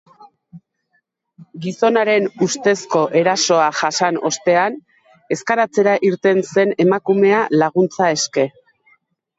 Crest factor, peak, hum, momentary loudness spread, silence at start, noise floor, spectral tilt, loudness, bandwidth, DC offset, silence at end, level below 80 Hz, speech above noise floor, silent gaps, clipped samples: 16 dB; -2 dBFS; none; 7 LU; 0.55 s; -67 dBFS; -4 dB/octave; -16 LUFS; 8 kHz; under 0.1%; 0.9 s; -68 dBFS; 51 dB; none; under 0.1%